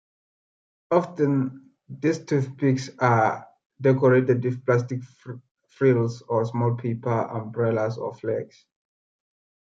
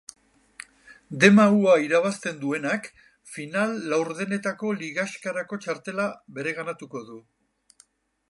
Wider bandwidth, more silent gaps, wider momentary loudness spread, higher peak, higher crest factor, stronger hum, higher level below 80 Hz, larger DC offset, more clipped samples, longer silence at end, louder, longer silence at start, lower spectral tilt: second, 7.6 kHz vs 11.5 kHz; first, 3.66-3.70 s, 5.51-5.55 s vs none; second, 13 LU vs 23 LU; about the same, -4 dBFS vs -2 dBFS; about the same, 20 dB vs 24 dB; neither; about the same, -70 dBFS vs -72 dBFS; neither; neither; first, 1.25 s vs 1.1 s; about the same, -24 LUFS vs -24 LUFS; about the same, 0.9 s vs 0.9 s; first, -8 dB/octave vs -5.5 dB/octave